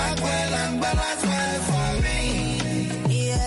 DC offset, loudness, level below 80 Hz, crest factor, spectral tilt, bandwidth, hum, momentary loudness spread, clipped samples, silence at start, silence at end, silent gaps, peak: under 0.1%; -24 LUFS; -32 dBFS; 10 dB; -4.5 dB/octave; 11.5 kHz; none; 2 LU; under 0.1%; 0 s; 0 s; none; -12 dBFS